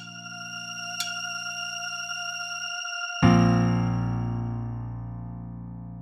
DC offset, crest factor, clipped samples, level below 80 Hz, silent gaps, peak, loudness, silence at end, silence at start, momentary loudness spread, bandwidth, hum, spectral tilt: under 0.1%; 22 dB; under 0.1%; -46 dBFS; none; -6 dBFS; -27 LUFS; 0 s; 0 s; 17 LU; 14 kHz; none; -5 dB/octave